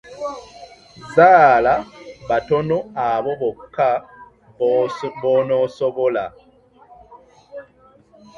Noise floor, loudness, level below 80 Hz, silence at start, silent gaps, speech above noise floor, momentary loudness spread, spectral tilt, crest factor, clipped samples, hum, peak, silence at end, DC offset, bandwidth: -52 dBFS; -18 LUFS; -54 dBFS; 0.1 s; none; 35 dB; 25 LU; -6.5 dB/octave; 20 dB; under 0.1%; none; 0 dBFS; 0.75 s; under 0.1%; 8 kHz